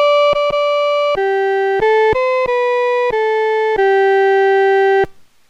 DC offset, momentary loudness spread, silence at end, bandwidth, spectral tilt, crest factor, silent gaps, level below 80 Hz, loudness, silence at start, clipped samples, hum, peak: under 0.1%; 3 LU; 0.35 s; 7.8 kHz; -4.5 dB/octave; 8 dB; none; -46 dBFS; -14 LUFS; 0 s; under 0.1%; none; -6 dBFS